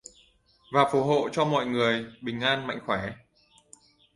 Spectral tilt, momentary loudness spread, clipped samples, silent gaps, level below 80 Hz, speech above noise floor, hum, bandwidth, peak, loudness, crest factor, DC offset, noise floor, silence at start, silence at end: -5.5 dB/octave; 8 LU; under 0.1%; none; -62 dBFS; 36 dB; none; 11.5 kHz; -6 dBFS; -26 LUFS; 22 dB; under 0.1%; -62 dBFS; 0.7 s; 1 s